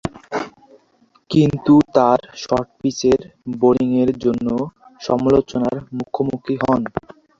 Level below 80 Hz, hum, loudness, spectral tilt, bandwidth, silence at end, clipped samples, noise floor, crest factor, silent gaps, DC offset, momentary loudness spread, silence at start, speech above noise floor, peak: -48 dBFS; none; -18 LUFS; -7 dB/octave; 7.6 kHz; 0.4 s; under 0.1%; -57 dBFS; 18 dB; none; under 0.1%; 13 LU; 0.05 s; 40 dB; -2 dBFS